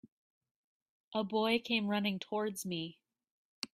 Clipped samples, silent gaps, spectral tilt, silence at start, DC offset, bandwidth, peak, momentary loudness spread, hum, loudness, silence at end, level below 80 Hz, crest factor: under 0.1%; 3.31-3.62 s; -4.5 dB/octave; 1.1 s; under 0.1%; 15.5 kHz; -18 dBFS; 9 LU; none; -35 LUFS; 0.05 s; -78 dBFS; 20 dB